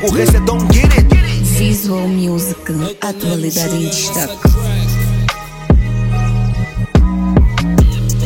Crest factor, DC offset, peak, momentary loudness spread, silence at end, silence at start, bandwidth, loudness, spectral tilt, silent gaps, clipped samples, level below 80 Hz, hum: 12 dB; under 0.1%; 0 dBFS; 8 LU; 0 s; 0 s; 17 kHz; -14 LUFS; -5.5 dB/octave; none; under 0.1%; -16 dBFS; none